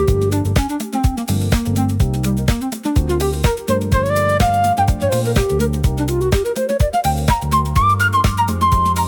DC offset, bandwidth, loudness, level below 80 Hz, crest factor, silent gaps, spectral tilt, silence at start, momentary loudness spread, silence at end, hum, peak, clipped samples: under 0.1%; 18 kHz; -17 LUFS; -24 dBFS; 12 dB; none; -6 dB/octave; 0 s; 4 LU; 0 s; none; -4 dBFS; under 0.1%